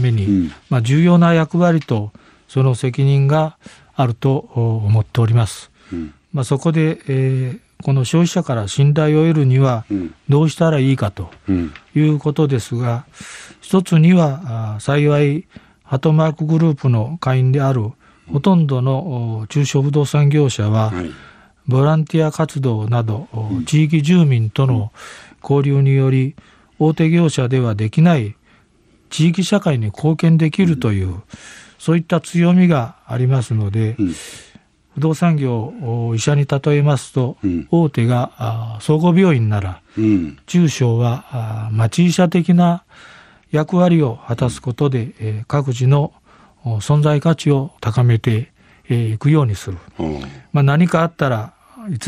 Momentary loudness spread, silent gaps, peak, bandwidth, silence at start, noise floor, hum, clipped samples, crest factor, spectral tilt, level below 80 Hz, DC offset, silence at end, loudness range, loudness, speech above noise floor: 11 LU; none; -2 dBFS; 11 kHz; 0 s; -54 dBFS; none; under 0.1%; 14 dB; -7.5 dB/octave; -48 dBFS; under 0.1%; 0 s; 3 LU; -16 LUFS; 38 dB